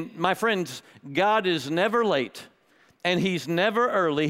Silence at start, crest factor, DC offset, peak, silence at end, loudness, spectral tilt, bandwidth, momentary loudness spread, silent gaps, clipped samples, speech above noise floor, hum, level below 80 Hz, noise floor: 0 s; 20 dB; under 0.1%; -4 dBFS; 0 s; -25 LUFS; -5 dB/octave; 16 kHz; 11 LU; none; under 0.1%; 36 dB; none; -68 dBFS; -61 dBFS